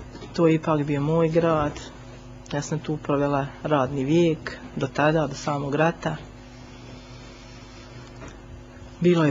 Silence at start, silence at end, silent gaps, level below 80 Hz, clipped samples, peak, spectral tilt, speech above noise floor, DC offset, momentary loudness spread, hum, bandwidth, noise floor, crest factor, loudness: 0 s; 0 s; none; -48 dBFS; under 0.1%; -6 dBFS; -7 dB/octave; 20 dB; under 0.1%; 22 LU; none; 7.6 kHz; -43 dBFS; 20 dB; -24 LUFS